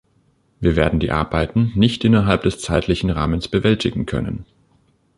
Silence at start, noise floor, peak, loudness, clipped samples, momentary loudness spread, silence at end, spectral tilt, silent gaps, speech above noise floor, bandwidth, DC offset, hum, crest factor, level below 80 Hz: 0.6 s; -60 dBFS; -2 dBFS; -19 LUFS; under 0.1%; 8 LU; 0.75 s; -6.5 dB/octave; none; 43 dB; 11.5 kHz; under 0.1%; none; 16 dB; -32 dBFS